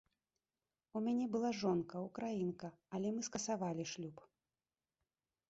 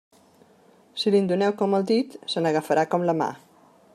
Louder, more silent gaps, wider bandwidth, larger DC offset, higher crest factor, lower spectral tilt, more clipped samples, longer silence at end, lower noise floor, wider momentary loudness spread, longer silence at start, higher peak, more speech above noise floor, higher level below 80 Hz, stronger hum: second, -41 LUFS vs -24 LUFS; neither; second, 8 kHz vs 13.5 kHz; neither; about the same, 18 dB vs 16 dB; about the same, -6 dB/octave vs -6 dB/octave; neither; first, 1.3 s vs 0.6 s; first, under -90 dBFS vs -56 dBFS; first, 10 LU vs 7 LU; about the same, 0.95 s vs 0.95 s; second, -24 dBFS vs -8 dBFS; first, over 50 dB vs 34 dB; about the same, -78 dBFS vs -76 dBFS; neither